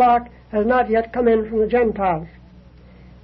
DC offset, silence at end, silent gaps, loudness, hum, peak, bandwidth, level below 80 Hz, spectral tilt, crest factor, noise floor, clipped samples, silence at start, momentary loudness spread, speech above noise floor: under 0.1%; 0.95 s; none; -19 LUFS; none; -6 dBFS; 5.4 kHz; -42 dBFS; -9.5 dB/octave; 12 dB; -45 dBFS; under 0.1%; 0 s; 8 LU; 27 dB